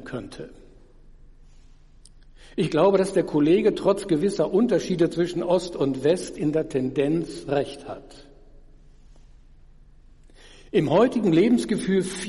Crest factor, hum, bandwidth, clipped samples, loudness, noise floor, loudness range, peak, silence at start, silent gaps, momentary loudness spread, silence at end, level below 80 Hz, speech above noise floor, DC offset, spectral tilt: 16 dB; none; 11.5 kHz; under 0.1%; -23 LUFS; -50 dBFS; 9 LU; -8 dBFS; 0 s; none; 16 LU; 0 s; -50 dBFS; 28 dB; under 0.1%; -6.5 dB/octave